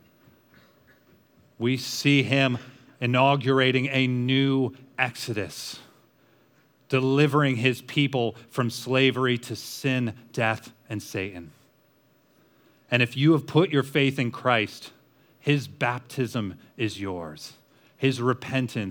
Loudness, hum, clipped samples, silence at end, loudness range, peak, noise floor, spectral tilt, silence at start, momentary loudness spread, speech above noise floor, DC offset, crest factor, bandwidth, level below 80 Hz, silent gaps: -25 LUFS; none; under 0.1%; 0 s; 6 LU; -6 dBFS; -63 dBFS; -5.5 dB/octave; 1.6 s; 13 LU; 38 dB; under 0.1%; 20 dB; 19.5 kHz; -70 dBFS; none